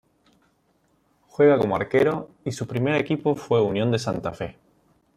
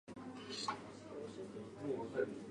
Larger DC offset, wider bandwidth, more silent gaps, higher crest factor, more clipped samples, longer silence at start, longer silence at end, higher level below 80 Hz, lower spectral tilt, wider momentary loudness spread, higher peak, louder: neither; first, 13 kHz vs 11 kHz; neither; about the same, 18 dB vs 20 dB; neither; first, 1.4 s vs 0.05 s; first, 0.65 s vs 0 s; first, -58 dBFS vs -76 dBFS; first, -6.5 dB/octave vs -4.5 dB/octave; first, 14 LU vs 9 LU; first, -6 dBFS vs -26 dBFS; first, -23 LUFS vs -45 LUFS